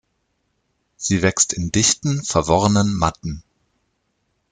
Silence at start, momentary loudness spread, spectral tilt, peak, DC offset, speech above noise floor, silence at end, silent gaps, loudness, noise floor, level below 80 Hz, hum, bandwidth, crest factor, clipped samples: 1 s; 13 LU; -4 dB/octave; -2 dBFS; under 0.1%; 51 dB; 1.1 s; none; -18 LUFS; -70 dBFS; -44 dBFS; none; 10 kHz; 20 dB; under 0.1%